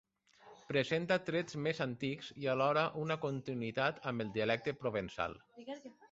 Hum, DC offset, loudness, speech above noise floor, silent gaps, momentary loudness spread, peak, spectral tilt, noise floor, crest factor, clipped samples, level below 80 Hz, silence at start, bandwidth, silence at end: none; under 0.1%; -36 LUFS; 25 dB; none; 8 LU; -18 dBFS; -4 dB/octave; -62 dBFS; 20 dB; under 0.1%; -70 dBFS; 0.45 s; 8 kHz; 0.05 s